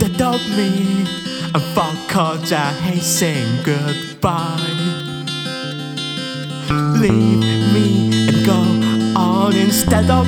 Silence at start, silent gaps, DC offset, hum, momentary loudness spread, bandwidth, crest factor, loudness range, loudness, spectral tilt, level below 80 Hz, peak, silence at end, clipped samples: 0 s; none; under 0.1%; none; 9 LU; 20 kHz; 16 dB; 6 LU; -17 LUFS; -5 dB/octave; -40 dBFS; 0 dBFS; 0 s; under 0.1%